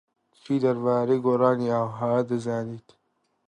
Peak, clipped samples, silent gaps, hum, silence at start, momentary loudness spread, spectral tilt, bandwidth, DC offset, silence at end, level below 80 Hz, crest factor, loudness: -8 dBFS; under 0.1%; none; none; 0.5 s; 9 LU; -8.5 dB/octave; 10 kHz; under 0.1%; 0.7 s; -70 dBFS; 18 dB; -25 LUFS